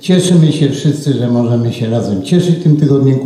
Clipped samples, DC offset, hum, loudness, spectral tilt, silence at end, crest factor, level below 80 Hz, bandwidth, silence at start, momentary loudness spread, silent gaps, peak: under 0.1%; under 0.1%; none; -12 LUFS; -7 dB/octave; 0 s; 10 dB; -54 dBFS; 12.5 kHz; 0.05 s; 5 LU; none; 0 dBFS